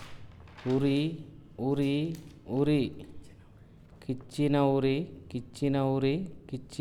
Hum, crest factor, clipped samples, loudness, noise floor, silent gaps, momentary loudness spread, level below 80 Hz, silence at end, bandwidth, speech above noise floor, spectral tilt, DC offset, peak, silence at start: none; 16 dB; under 0.1%; -30 LUFS; -54 dBFS; none; 18 LU; -56 dBFS; 0 s; 12 kHz; 24 dB; -7.5 dB/octave; under 0.1%; -14 dBFS; 0 s